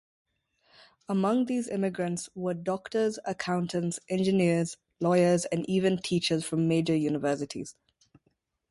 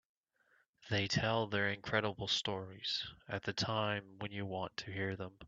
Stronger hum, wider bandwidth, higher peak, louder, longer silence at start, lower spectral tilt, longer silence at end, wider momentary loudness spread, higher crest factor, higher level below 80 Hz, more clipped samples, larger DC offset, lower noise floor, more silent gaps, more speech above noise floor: neither; first, 11.5 kHz vs 7.8 kHz; first, -12 dBFS vs -16 dBFS; first, -28 LUFS vs -37 LUFS; first, 1.1 s vs 0.8 s; about the same, -5.5 dB/octave vs -4.5 dB/octave; first, 1 s vs 0 s; about the same, 8 LU vs 8 LU; second, 16 dB vs 22 dB; about the same, -66 dBFS vs -68 dBFS; neither; neither; about the same, -74 dBFS vs -75 dBFS; neither; first, 47 dB vs 37 dB